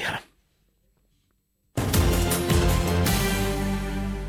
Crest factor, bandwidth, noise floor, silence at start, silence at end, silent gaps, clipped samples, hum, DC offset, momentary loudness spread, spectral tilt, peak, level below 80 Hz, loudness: 16 dB; 16 kHz; -70 dBFS; 0 s; 0 s; none; under 0.1%; none; under 0.1%; 8 LU; -5 dB/octave; -10 dBFS; -30 dBFS; -24 LUFS